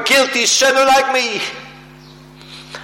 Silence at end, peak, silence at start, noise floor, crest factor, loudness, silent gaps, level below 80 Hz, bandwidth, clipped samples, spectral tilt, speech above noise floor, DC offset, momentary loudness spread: 0 s; -4 dBFS; 0 s; -40 dBFS; 14 dB; -13 LUFS; none; -54 dBFS; 16.5 kHz; under 0.1%; -0.5 dB/octave; 26 dB; under 0.1%; 21 LU